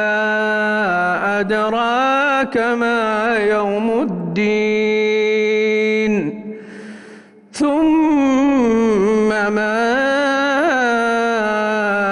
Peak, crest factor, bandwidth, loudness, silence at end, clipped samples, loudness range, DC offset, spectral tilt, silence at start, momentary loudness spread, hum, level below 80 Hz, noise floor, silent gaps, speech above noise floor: -8 dBFS; 8 dB; 11 kHz; -16 LUFS; 0 s; under 0.1%; 3 LU; under 0.1%; -5.5 dB/octave; 0 s; 5 LU; none; -52 dBFS; -41 dBFS; none; 25 dB